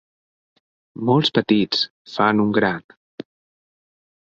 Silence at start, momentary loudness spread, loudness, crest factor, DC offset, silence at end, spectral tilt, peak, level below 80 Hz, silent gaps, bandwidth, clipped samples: 1 s; 20 LU; -19 LUFS; 20 dB; under 0.1%; 1.5 s; -6.5 dB/octave; -2 dBFS; -60 dBFS; 1.90-2.05 s; 7.8 kHz; under 0.1%